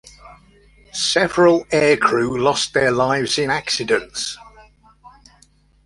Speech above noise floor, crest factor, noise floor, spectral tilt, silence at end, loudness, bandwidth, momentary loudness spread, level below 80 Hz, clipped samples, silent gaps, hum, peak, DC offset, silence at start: 37 dB; 18 dB; -55 dBFS; -3.5 dB/octave; 0.75 s; -17 LUFS; 11.5 kHz; 11 LU; -52 dBFS; under 0.1%; none; 50 Hz at -55 dBFS; -2 dBFS; under 0.1%; 0.25 s